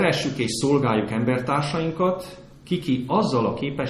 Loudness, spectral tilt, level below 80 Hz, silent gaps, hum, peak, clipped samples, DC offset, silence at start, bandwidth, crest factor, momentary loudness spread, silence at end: -23 LUFS; -5.5 dB/octave; -52 dBFS; none; none; -6 dBFS; under 0.1%; under 0.1%; 0 s; 13.5 kHz; 16 dB; 6 LU; 0 s